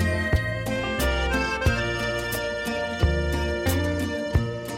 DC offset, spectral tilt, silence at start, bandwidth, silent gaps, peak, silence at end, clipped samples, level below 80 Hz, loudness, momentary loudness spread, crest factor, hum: under 0.1%; -5.5 dB/octave; 0 s; 16.5 kHz; none; -8 dBFS; 0 s; under 0.1%; -32 dBFS; -25 LUFS; 4 LU; 16 dB; none